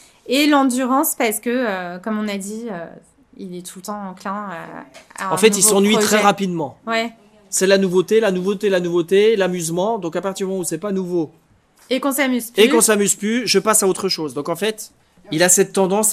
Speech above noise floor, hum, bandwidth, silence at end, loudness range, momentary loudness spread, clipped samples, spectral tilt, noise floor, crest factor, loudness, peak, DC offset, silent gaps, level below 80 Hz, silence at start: 35 dB; none; 15.5 kHz; 0 s; 8 LU; 17 LU; under 0.1%; -3 dB/octave; -53 dBFS; 18 dB; -17 LUFS; 0 dBFS; under 0.1%; none; -64 dBFS; 0.25 s